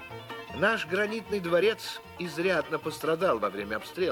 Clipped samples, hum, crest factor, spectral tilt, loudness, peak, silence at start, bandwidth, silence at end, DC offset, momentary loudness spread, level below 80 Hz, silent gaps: under 0.1%; none; 18 dB; -4.5 dB/octave; -29 LUFS; -12 dBFS; 0 s; 19 kHz; 0 s; under 0.1%; 12 LU; -60 dBFS; none